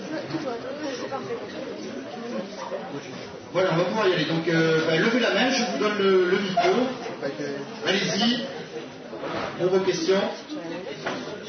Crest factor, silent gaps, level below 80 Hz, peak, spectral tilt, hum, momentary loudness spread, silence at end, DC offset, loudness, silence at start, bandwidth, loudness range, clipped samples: 18 dB; none; -68 dBFS; -8 dBFS; -4.5 dB/octave; none; 14 LU; 0 s; under 0.1%; -25 LUFS; 0 s; 6.6 kHz; 8 LU; under 0.1%